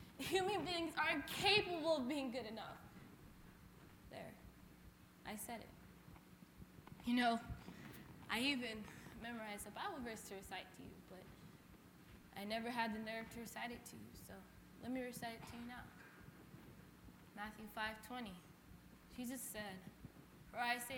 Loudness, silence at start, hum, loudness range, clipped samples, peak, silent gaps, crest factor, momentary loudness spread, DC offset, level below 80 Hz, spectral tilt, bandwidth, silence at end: -44 LUFS; 0 s; none; 13 LU; under 0.1%; -22 dBFS; none; 26 dB; 23 LU; under 0.1%; -68 dBFS; -3.5 dB/octave; 17 kHz; 0 s